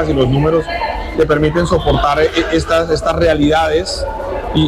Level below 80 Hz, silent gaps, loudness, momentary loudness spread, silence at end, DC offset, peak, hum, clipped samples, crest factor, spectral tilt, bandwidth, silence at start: -26 dBFS; none; -14 LUFS; 7 LU; 0 s; under 0.1%; -4 dBFS; none; under 0.1%; 10 dB; -6 dB/octave; 14.5 kHz; 0 s